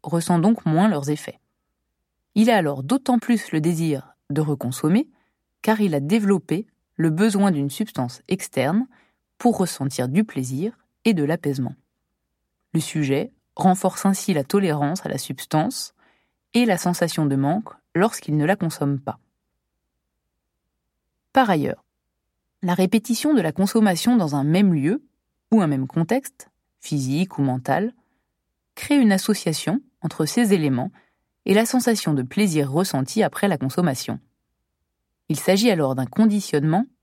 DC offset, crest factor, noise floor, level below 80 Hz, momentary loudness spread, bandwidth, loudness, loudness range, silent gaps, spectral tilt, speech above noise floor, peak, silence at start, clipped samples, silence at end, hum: under 0.1%; 20 dB; -77 dBFS; -66 dBFS; 10 LU; 16.5 kHz; -22 LUFS; 4 LU; none; -6 dB/octave; 57 dB; -2 dBFS; 0.05 s; under 0.1%; 0.2 s; none